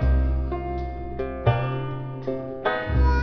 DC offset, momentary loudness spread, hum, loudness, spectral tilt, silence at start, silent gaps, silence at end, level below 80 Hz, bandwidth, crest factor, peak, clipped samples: 0.3%; 9 LU; none; -27 LUFS; -9 dB/octave; 0 s; none; 0 s; -26 dBFS; 5.4 kHz; 16 dB; -6 dBFS; under 0.1%